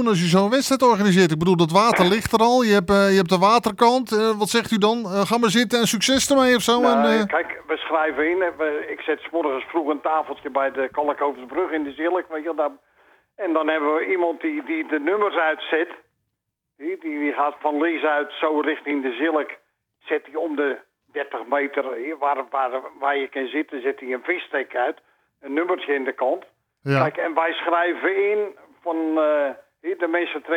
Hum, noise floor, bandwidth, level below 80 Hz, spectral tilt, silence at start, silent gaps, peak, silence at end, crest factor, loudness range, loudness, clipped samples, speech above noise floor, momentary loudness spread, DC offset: none; -80 dBFS; over 20 kHz; -58 dBFS; -4.5 dB/octave; 0 s; none; -2 dBFS; 0 s; 18 dB; 8 LU; -21 LUFS; under 0.1%; 59 dB; 11 LU; under 0.1%